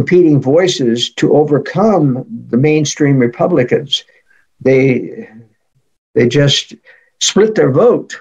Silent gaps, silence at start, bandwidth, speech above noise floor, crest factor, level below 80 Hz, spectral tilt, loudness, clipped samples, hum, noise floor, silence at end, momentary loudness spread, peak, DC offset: 5.98-6.14 s; 0 s; 11 kHz; 49 dB; 12 dB; -52 dBFS; -5 dB/octave; -12 LUFS; under 0.1%; none; -61 dBFS; 0 s; 8 LU; 0 dBFS; under 0.1%